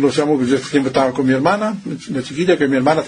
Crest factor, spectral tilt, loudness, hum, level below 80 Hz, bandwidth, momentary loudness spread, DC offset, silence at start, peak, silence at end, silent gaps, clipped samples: 16 dB; -6 dB/octave; -17 LUFS; none; -54 dBFS; 10 kHz; 9 LU; under 0.1%; 0 s; 0 dBFS; 0 s; none; under 0.1%